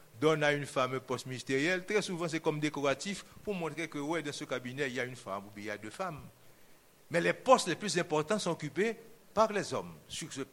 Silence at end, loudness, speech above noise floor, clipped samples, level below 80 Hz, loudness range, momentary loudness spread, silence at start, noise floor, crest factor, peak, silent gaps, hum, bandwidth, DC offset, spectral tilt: 0.05 s; -33 LUFS; 26 dB; under 0.1%; -70 dBFS; 7 LU; 13 LU; 0.15 s; -59 dBFS; 24 dB; -10 dBFS; none; none; 17 kHz; under 0.1%; -4.5 dB/octave